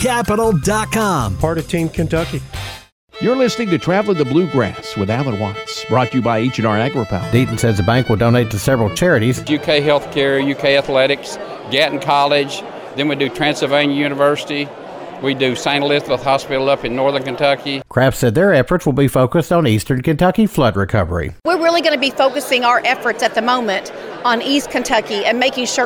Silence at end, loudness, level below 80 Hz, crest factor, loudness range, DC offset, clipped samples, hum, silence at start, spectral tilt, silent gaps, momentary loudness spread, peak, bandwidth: 0 s; -16 LUFS; -38 dBFS; 14 dB; 3 LU; under 0.1%; under 0.1%; none; 0 s; -5 dB/octave; 2.92-3.08 s; 7 LU; 0 dBFS; 19.5 kHz